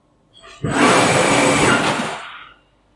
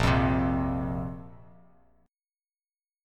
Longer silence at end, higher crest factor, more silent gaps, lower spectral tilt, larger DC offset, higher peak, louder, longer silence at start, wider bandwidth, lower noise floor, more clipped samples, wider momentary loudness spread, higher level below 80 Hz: second, 0.55 s vs 1.65 s; about the same, 18 dB vs 18 dB; neither; second, -3.5 dB/octave vs -7 dB/octave; neither; first, 0 dBFS vs -12 dBFS; first, -15 LUFS vs -28 LUFS; first, 0.45 s vs 0 s; about the same, 11.5 kHz vs 12.5 kHz; second, -50 dBFS vs under -90 dBFS; neither; about the same, 16 LU vs 14 LU; second, -46 dBFS vs -40 dBFS